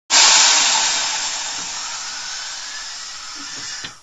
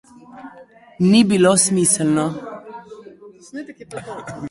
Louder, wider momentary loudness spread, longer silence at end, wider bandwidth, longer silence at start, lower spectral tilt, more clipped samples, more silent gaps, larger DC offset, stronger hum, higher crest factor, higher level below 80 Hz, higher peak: about the same, -15 LUFS vs -15 LUFS; second, 19 LU vs 23 LU; about the same, 0.05 s vs 0 s; about the same, 11 kHz vs 11.5 kHz; second, 0.1 s vs 0.35 s; second, 3 dB/octave vs -4.5 dB/octave; neither; neither; first, 0.4% vs under 0.1%; neither; about the same, 20 dB vs 18 dB; about the same, -56 dBFS vs -58 dBFS; about the same, 0 dBFS vs -2 dBFS